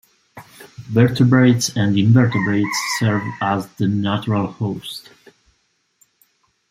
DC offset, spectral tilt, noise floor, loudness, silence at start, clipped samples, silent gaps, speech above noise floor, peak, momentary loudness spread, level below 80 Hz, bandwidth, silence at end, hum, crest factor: under 0.1%; -6 dB/octave; -66 dBFS; -18 LUFS; 0.35 s; under 0.1%; none; 49 dB; -2 dBFS; 11 LU; -56 dBFS; 15.5 kHz; 1.7 s; none; 16 dB